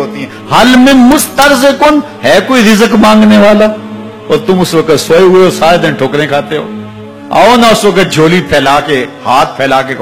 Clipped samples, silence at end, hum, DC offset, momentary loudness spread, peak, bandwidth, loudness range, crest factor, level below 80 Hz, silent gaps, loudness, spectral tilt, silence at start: 5%; 0 s; none; 1%; 13 LU; 0 dBFS; 19.5 kHz; 3 LU; 6 dB; -36 dBFS; none; -6 LUFS; -4.5 dB/octave; 0 s